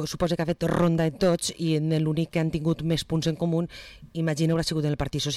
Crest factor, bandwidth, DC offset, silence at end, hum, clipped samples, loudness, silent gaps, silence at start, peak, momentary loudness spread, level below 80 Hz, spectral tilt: 12 dB; 14 kHz; under 0.1%; 0 s; none; under 0.1%; -26 LUFS; none; 0 s; -14 dBFS; 5 LU; -46 dBFS; -6 dB/octave